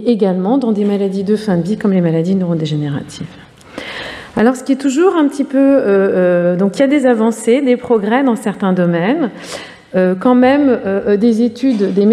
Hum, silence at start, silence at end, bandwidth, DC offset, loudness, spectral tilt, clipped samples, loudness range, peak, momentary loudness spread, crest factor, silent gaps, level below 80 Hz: none; 0 s; 0 s; 12.5 kHz; under 0.1%; -13 LUFS; -7 dB/octave; under 0.1%; 5 LU; -2 dBFS; 13 LU; 12 dB; none; -54 dBFS